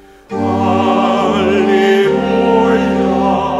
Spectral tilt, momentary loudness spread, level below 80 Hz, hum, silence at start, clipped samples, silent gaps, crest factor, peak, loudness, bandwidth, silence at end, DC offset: -6.5 dB/octave; 4 LU; -40 dBFS; none; 0.3 s; under 0.1%; none; 12 dB; 0 dBFS; -13 LUFS; 12 kHz; 0 s; under 0.1%